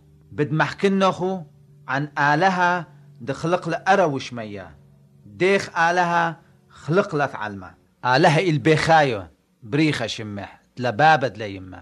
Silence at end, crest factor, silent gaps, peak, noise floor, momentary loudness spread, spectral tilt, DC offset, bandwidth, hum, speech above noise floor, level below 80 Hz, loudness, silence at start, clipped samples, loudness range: 0 s; 18 dB; none; -4 dBFS; -50 dBFS; 16 LU; -5.5 dB/octave; under 0.1%; 11.5 kHz; none; 29 dB; -58 dBFS; -21 LUFS; 0.3 s; under 0.1%; 3 LU